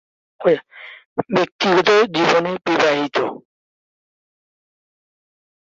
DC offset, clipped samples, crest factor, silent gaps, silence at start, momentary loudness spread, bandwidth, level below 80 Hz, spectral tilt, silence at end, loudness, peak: under 0.1%; under 0.1%; 18 dB; 1.05-1.16 s, 1.52-1.59 s; 0.4 s; 13 LU; 7.8 kHz; -64 dBFS; -4.5 dB/octave; 2.45 s; -18 LUFS; -2 dBFS